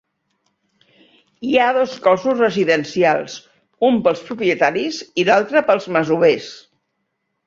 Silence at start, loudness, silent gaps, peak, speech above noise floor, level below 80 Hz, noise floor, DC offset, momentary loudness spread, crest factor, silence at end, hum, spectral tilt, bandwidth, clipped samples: 1.4 s; -17 LUFS; none; -2 dBFS; 56 dB; -62 dBFS; -73 dBFS; under 0.1%; 8 LU; 18 dB; 0.9 s; none; -5 dB/octave; 7.6 kHz; under 0.1%